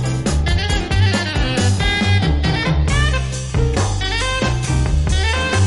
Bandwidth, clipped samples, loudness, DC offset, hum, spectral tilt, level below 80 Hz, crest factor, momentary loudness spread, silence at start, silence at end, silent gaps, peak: 11.5 kHz; under 0.1%; -17 LUFS; under 0.1%; none; -5 dB/octave; -22 dBFS; 12 dB; 3 LU; 0 s; 0 s; none; -4 dBFS